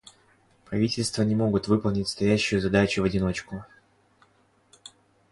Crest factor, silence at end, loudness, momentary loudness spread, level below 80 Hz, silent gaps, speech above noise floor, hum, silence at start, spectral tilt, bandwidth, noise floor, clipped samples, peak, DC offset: 20 dB; 1.65 s; -25 LUFS; 10 LU; -48 dBFS; none; 39 dB; none; 0.7 s; -5.5 dB/octave; 11.5 kHz; -63 dBFS; under 0.1%; -8 dBFS; under 0.1%